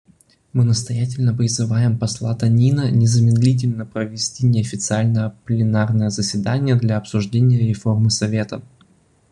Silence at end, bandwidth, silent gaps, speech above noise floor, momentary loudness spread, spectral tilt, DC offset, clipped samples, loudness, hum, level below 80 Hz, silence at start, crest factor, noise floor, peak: 0.7 s; 10.5 kHz; none; 38 dB; 7 LU; -6 dB/octave; under 0.1%; under 0.1%; -18 LUFS; none; -50 dBFS; 0.55 s; 14 dB; -55 dBFS; -4 dBFS